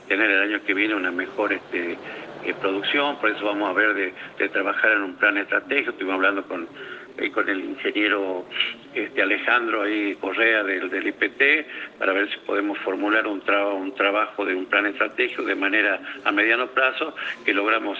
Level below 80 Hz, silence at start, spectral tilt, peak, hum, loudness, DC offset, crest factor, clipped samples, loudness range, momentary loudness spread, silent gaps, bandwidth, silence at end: -72 dBFS; 0 s; -4.5 dB/octave; -4 dBFS; none; -22 LUFS; under 0.1%; 20 dB; under 0.1%; 3 LU; 9 LU; none; 7.4 kHz; 0 s